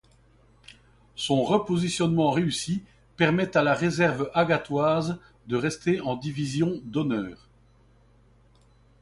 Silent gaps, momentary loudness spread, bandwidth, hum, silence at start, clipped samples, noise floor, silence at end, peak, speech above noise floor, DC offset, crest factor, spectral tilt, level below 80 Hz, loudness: none; 9 LU; 11.5 kHz; none; 1.15 s; under 0.1%; -58 dBFS; 1.65 s; -8 dBFS; 34 dB; under 0.1%; 18 dB; -5.5 dB/octave; -58 dBFS; -25 LUFS